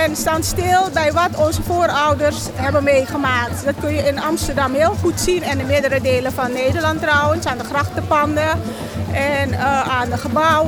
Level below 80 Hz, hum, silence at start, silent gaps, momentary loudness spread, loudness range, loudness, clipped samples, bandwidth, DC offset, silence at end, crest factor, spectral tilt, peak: -36 dBFS; none; 0 s; none; 5 LU; 1 LU; -17 LUFS; under 0.1%; over 20 kHz; under 0.1%; 0 s; 14 dB; -4.5 dB/octave; -4 dBFS